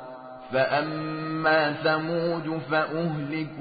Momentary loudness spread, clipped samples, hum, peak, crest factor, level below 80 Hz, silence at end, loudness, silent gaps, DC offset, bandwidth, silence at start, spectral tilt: 9 LU; under 0.1%; none; -10 dBFS; 16 dB; -66 dBFS; 0 s; -26 LUFS; none; under 0.1%; 5 kHz; 0 s; -10.5 dB/octave